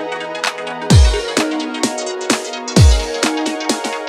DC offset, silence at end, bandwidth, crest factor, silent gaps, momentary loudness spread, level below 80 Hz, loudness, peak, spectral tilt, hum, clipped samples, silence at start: under 0.1%; 0 s; 13.5 kHz; 16 dB; none; 9 LU; -20 dBFS; -16 LUFS; 0 dBFS; -4.5 dB/octave; none; under 0.1%; 0 s